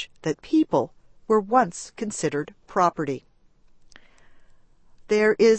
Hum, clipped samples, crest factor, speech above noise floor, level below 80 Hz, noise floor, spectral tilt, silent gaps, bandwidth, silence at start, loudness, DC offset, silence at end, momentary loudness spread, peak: none; under 0.1%; 20 dB; 33 dB; -58 dBFS; -55 dBFS; -5 dB/octave; none; 8.8 kHz; 0 s; -24 LUFS; under 0.1%; 0 s; 11 LU; -6 dBFS